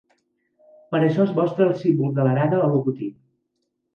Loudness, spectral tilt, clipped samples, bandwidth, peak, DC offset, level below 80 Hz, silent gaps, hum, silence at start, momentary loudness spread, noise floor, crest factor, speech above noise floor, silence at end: -21 LUFS; -10 dB/octave; under 0.1%; 6.6 kHz; -6 dBFS; under 0.1%; -68 dBFS; none; none; 0.9 s; 8 LU; -75 dBFS; 16 dB; 55 dB; 0.85 s